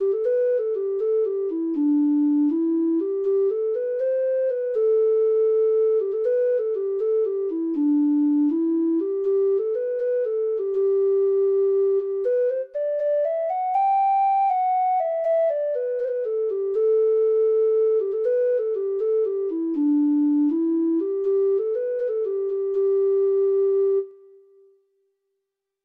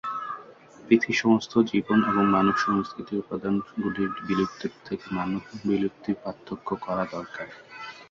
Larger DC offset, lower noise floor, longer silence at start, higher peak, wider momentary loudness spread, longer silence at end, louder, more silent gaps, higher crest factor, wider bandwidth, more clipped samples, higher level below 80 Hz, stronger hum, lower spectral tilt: neither; first, -81 dBFS vs -48 dBFS; about the same, 0 s vs 0.05 s; second, -14 dBFS vs -6 dBFS; second, 5 LU vs 15 LU; first, 1.7 s vs 0.05 s; first, -22 LUFS vs -26 LUFS; neither; second, 8 dB vs 20 dB; second, 3.1 kHz vs 7.4 kHz; neither; second, -76 dBFS vs -60 dBFS; neither; first, -8 dB/octave vs -6.5 dB/octave